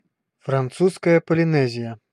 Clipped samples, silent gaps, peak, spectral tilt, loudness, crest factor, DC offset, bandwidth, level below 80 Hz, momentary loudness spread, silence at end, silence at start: under 0.1%; none; -4 dBFS; -7.5 dB/octave; -20 LUFS; 16 dB; under 0.1%; 11.5 kHz; -64 dBFS; 10 LU; 0.15 s; 0.45 s